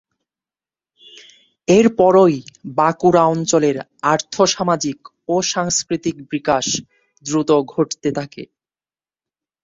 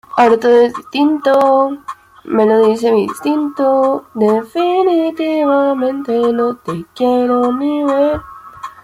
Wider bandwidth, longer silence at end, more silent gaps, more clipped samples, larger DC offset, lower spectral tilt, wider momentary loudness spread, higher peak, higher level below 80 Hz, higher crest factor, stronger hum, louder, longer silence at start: second, 7.8 kHz vs 15.5 kHz; first, 1.2 s vs 0.15 s; neither; neither; neither; second, -4.5 dB/octave vs -6 dB/octave; first, 13 LU vs 8 LU; about the same, -2 dBFS vs 0 dBFS; second, -56 dBFS vs -50 dBFS; first, 18 dB vs 12 dB; neither; second, -17 LUFS vs -14 LUFS; first, 1.7 s vs 0.1 s